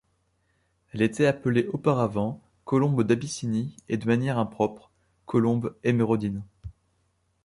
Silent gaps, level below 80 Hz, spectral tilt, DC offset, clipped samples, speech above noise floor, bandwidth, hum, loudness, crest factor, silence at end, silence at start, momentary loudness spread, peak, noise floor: none; -56 dBFS; -7 dB/octave; under 0.1%; under 0.1%; 46 dB; 11.5 kHz; none; -26 LUFS; 18 dB; 0.75 s; 0.95 s; 11 LU; -8 dBFS; -71 dBFS